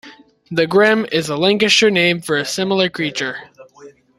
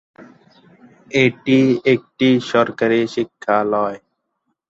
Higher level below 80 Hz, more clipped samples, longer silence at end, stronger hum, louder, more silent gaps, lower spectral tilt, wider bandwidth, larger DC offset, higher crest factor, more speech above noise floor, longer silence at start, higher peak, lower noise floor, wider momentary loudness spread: about the same, -58 dBFS vs -60 dBFS; neither; second, 0.3 s vs 0.7 s; neither; about the same, -15 LUFS vs -17 LUFS; neither; second, -3.5 dB/octave vs -6.5 dB/octave; first, 13.5 kHz vs 7.8 kHz; neither; about the same, 16 dB vs 16 dB; second, 27 dB vs 56 dB; second, 0.05 s vs 0.2 s; about the same, -2 dBFS vs -2 dBFS; second, -43 dBFS vs -72 dBFS; first, 11 LU vs 8 LU